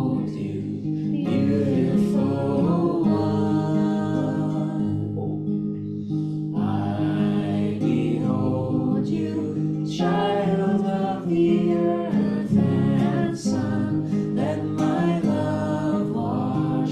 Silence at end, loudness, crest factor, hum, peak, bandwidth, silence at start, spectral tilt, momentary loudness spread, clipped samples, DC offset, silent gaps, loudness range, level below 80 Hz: 0 s; -23 LUFS; 14 dB; none; -8 dBFS; 9.4 kHz; 0 s; -8.5 dB/octave; 6 LU; under 0.1%; under 0.1%; none; 3 LU; -54 dBFS